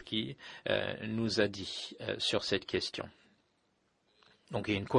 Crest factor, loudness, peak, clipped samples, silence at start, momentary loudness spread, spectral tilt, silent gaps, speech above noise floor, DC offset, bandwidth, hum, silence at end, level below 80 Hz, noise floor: 22 dB; -35 LUFS; -14 dBFS; under 0.1%; 0 s; 10 LU; -4.5 dB/octave; none; 41 dB; under 0.1%; 11 kHz; none; 0 s; -66 dBFS; -76 dBFS